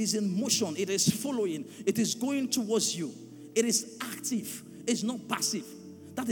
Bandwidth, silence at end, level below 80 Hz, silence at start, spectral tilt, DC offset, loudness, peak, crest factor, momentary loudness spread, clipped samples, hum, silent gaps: 19 kHz; 0 s; -78 dBFS; 0 s; -3.5 dB/octave; under 0.1%; -30 LUFS; -12 dBFS; 20 dB; 11 LU; under 0.1%; none; none